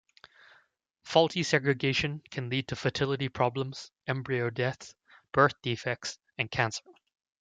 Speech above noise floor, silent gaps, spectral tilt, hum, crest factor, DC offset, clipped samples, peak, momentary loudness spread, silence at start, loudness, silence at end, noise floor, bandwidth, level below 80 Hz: 38 dB; none; -5 dB/octave; none; 22 dB; under 0.1%; under 0.1%; -8 dBFS; 12 LU; 1.05 s; -30 LUFS; 0.5 s; -68 dBFS; 9.2 kHz; -62 dBFS